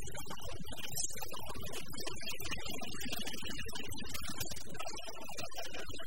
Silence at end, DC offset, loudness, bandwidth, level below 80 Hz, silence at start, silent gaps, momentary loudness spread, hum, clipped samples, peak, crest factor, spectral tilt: 0 s; 2%; -43 LUFS; 16.5 kHz; -56 dBFS; 0 s; none; 6 LU; none; under 0.1%; -22 dBFS; 22 dB; -2.5 dB/octave